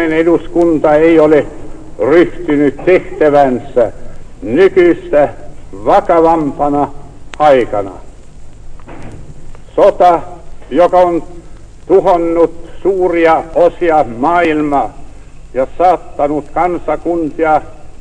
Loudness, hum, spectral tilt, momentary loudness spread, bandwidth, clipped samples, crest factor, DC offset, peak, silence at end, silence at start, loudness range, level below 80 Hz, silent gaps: -11 LUFS; none; -7 dB/octave; 12 LU; 10 kHz; 0.9%; 12 dB; under 0.1%; 0 dBFS; 0.05 s; 0 s; 4 LU; -32 dBFS; none